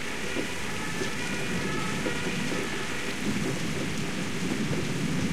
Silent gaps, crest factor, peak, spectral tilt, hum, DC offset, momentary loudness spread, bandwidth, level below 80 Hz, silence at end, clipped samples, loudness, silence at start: none; 14 dB; -16 dBFS; -4 dB/octave; none; 2%; 2 LU; 16 kHz; -50 dBFS; 0 s; under 0.1%; -30 LUFS; 0 s